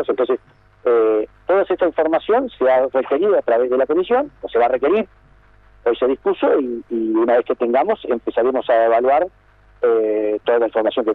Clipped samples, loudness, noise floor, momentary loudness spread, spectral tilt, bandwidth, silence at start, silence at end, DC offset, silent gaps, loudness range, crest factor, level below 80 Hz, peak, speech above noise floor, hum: under 0.1%; -18 LUFS; -49 dBFS; 6 LU; -7.5 dB/octave; 4.1 kHz; 0 s; 0 s; under 0.1%; none; 2 LU; 12 dB; -54 dBFS; -6 dBFS; 32 dB; none